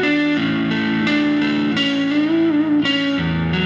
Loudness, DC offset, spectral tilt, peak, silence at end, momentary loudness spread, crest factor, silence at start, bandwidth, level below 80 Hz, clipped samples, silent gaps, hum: -18 LUFS; under 0.1%; -6 dB/octave; -6 dBFS; 0 s; 2 LU; 12 dB; 0 s; 7.4 kHz; -44 dBFS; under 0.1%; none; none